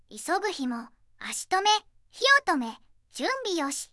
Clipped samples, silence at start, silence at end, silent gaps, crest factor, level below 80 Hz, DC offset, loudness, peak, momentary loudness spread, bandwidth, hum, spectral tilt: under 0.1%; 0.1 s; 0.05 s; none; 20 dB; -68 dBFS; under 0.1%; -26 LUFS; -8 dBFS; 16 LU; 12 kHz; none; -0.5 dB/octave